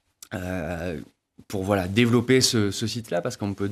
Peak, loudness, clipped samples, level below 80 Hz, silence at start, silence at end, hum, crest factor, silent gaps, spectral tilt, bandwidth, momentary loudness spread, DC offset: -6 dBFS; -24 LUFS; under 0.1%; -52 dBFS; 0.3 s; 0 s; none; 20 dB; none; -4.5 dB/octave; 14.5 kHz; 15 LU; under 0.1%